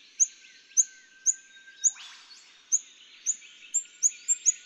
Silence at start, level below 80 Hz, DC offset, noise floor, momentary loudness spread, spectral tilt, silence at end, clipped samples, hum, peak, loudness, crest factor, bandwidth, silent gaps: 0.2 s; under -90 dBFS; under 0.1%; -53 dBFS; 10 LU; 6 dB/octave; 0.1 s; under 0.1%; none; -10 dBFS; -27 LUFS; 22 dB; over 20 kHz; none